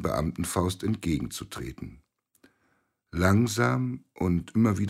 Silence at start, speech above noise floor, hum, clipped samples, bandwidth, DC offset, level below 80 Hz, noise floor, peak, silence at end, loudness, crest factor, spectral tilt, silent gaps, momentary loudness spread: 0 s; 45 dB; none; under 0.1%; 16 kHz; under 0.1%; -48 dBFS; -72 dBFS; -8 dBFS; 0 s; -28 LUFS; 18 dB; -6 dB/octave; none; 15 LU